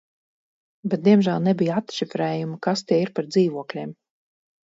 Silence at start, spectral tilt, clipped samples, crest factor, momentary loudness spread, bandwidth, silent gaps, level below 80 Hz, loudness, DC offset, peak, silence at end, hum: 0.85 s; -7 dB/octave; under 0.1%; 18 dB; 14 LU; 7.8 kHz; none; -68 dBFS; -22 LUFS; under 0.1%; -4 dBFS; 0.75 s; none